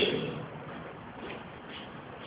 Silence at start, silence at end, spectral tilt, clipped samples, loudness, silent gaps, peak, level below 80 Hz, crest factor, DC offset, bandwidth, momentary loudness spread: 0 s; 0 s; -3 dB/octave; under 0.1%; -39 LUFS; none; -14 dBFS; -62 dBFS; 22 dB; under 0.1%; 4 kHz; 10 LU